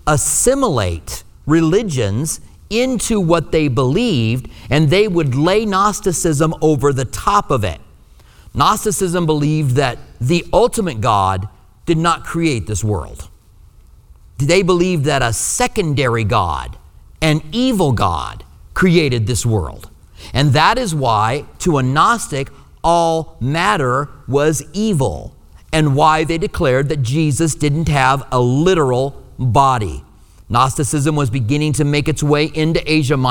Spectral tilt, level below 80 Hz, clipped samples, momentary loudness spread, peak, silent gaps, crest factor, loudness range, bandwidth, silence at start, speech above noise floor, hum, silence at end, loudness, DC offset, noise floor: -5 dB/octave; -34 dBFS; under 0.1%; 9 LU; 0 dBFS; none; 16 dB; 2 LU; 20 kHz; 0.05 s; 29 dB; none; 0 s; -16 LUFS; under 0.1%; -44 dBFS